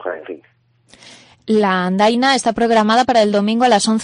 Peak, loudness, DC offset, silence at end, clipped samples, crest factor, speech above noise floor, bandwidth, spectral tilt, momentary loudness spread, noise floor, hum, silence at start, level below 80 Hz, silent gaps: -2 dBFS; -14 LUFS; under 0.1%; 0 s; under 0.1%; 14 dB; 34 dB; 10.5 kHz; -4.5 dB/octave; 17 LU; -49 dBFS; none; 0 s; -56 dBFS; none